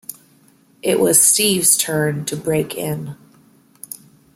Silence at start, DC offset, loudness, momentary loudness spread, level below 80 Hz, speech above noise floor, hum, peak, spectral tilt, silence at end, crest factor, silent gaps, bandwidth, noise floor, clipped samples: 0.1 s; under 0.1%; -15 LUFS; 23 LU; -60 dBFS; 36 dB; none; 0 dBFS; -3 dB/octave; 1.2 s; 20 dB; none; 16.5 kHz; -53 dBFS; under 0.1%